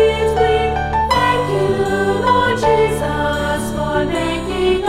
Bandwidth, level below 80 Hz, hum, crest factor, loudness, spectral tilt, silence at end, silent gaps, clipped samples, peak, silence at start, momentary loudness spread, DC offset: 16 kHz; -30 dBFS; none; 14 dB; -16 LUFS; -5.5 dB/octave; 0 s; none; under 0.1%; -2 dBFS; 0 s; 5 LU; under 0.1%